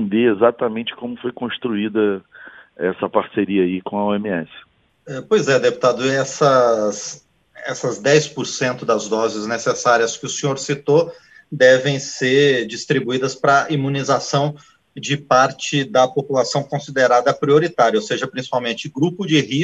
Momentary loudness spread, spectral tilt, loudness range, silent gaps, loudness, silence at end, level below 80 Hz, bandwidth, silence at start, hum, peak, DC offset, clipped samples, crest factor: 10 LU; -4.5 dB/octave; 5 LU; none; -18 LUFS; 0 s; -62 dBFS; 8.6 kHz; 0 s; none; 0 dBFS; under 0.1%; under 0.1%; 18 dB